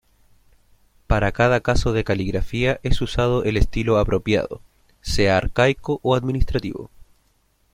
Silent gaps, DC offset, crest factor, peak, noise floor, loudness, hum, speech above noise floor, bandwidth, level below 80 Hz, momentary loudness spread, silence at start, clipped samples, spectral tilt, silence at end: none; under 0.1%; 18 dB; -2 dBFS; -63 dBFS; -21 LUFS; none; 43 dB; 14 kHz; -30 dBFS; 8 LU; 1.1 s; under 0.1%; -6 dB/octave; 0.7 s